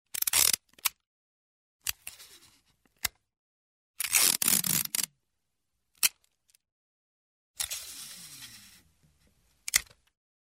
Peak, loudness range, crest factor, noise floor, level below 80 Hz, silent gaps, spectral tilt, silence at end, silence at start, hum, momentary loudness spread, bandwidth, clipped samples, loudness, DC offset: -2 dBFS; 13 LU; 32 dB; -84 dBFS; -66 dBFS; 1.07-1.79 s, 3.37-3.94 s, 6.72-7.54 s; 1 dB/octave; 0.75 s; 0.2 s; none; 21 LU; 16.5 kHz; under 0.1%; -27 LUFS; under 0.1%